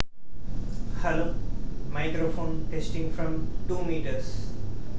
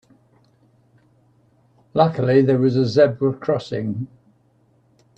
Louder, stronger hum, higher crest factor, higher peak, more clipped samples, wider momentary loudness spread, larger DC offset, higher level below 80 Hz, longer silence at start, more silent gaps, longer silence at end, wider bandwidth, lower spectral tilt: second, -33 LUFS vs -19 LUFS; neither; about the same, 24 dB vs 20 dB; about the same, -4 dBFS vs -2 dBFS; neither; about the same, 9 LU vs 11 LU; first, 6% vs under 0.1%; first, -34 dBFS vs -62 dBFS; second, 0 s vs 1.95 s; neither; second, 0 s vs 1.1 s; about the same, 8 kHz vs 8.2 kHz; about the same, -7 dB/octave vs -8 dB/octave